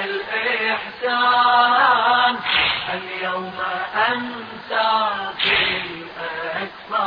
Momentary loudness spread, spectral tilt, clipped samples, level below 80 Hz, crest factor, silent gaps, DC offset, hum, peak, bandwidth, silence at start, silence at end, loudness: 12 LU; -5 dB/octave; under 0.1%; -56 dBFS; 16 dB; none; under 0.1%; none; -4 dBFS; 5.2 kHz; 0 s; 0 s; -19 LUFS